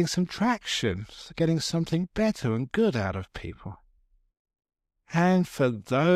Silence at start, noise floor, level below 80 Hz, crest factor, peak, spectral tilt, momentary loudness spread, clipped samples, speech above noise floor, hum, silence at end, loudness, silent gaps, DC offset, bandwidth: 0 s; -65 dBFS; -52 dBFS; 18 dB; -10 dBFS; -5.5 dB/octave; 15 LU; under 0.1%; 39 dB; none; 0 s; -27 LUFS; 4.39-4.45 s; under 0.1%; 14.5 kHz